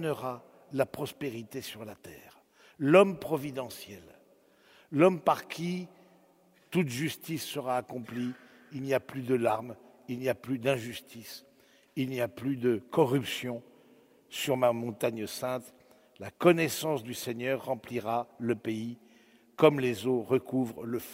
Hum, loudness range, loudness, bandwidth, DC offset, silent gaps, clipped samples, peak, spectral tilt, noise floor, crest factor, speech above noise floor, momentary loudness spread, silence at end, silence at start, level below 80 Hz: none; 4 LU; -31 LUFS; 16 kHz; under 0.1%; none; under 0.1%; -6 dBFS; -5.5 dB/octave; -64 dBFS; 24 dB; 33 dB; 20 LU; 0 s; 0 s; -72 dBFS